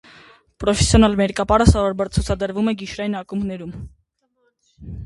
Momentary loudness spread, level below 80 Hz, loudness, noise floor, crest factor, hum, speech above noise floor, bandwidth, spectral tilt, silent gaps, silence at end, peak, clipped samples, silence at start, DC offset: 15 LU; -28 dBFS; -19 LUFS; -67 dBFS; 20 dB; none; 49 dB; 11.5 kHz; -5.5 dB/octave; none; 0 s; 0 dBFS; under 0.1%; 0.6 s; under 0.1%